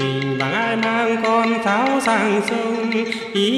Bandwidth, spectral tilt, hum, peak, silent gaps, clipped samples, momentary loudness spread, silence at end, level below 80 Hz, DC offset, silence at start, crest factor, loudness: 13.5 kHz; -5 dB/octave; none; -6 dBFS; none; under 0.1%; 4 LU; 0 s; -62 dBFS; under 0.1%; 0 s; 12 dB; -19 LUFS